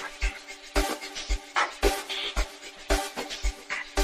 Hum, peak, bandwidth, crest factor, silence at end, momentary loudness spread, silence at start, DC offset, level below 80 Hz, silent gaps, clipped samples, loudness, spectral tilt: none; -8 dBFS; 15 kHz; 22 dB; 0 s; 7 LU; 0 s; under 0.1%; -34 dBFS; none; under 0.1%; -30 LUFS; -3 dB/octave